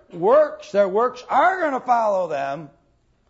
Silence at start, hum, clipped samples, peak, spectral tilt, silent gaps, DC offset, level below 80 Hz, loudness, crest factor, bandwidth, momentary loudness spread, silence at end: 0.15 s; none; under 0.1%; -6 dBFS; -5.5 dB/octave; none; under 0.1%; -66 dBFS; -20 LUFS; 16 dB; 7.8 kHz; 9 LU; 0.65 s